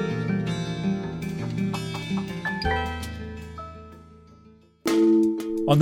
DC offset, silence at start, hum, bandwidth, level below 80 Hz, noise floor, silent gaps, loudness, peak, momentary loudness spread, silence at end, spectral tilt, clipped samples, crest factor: under 0.1%; 0 s; none; 16.5 kHz; -44 dBFS; -53 dBFS; none; -26 LUFS; -6 dBFS; 17 LU; 0 s; -6.5 dB/octave; under 0.1%; 20 dB